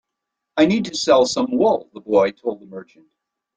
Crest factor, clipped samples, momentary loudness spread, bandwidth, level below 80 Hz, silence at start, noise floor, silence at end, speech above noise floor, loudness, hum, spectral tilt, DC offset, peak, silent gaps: 18 dB; under 0.1%; 16 LU; 9.4 kHz; -60 dBFS; 0.55 s; -81 dBFS; 0.75 s; 62 dB; -19 LUFS; none; -4.5 dB/octave; under 0.1%; -2 dBFS; none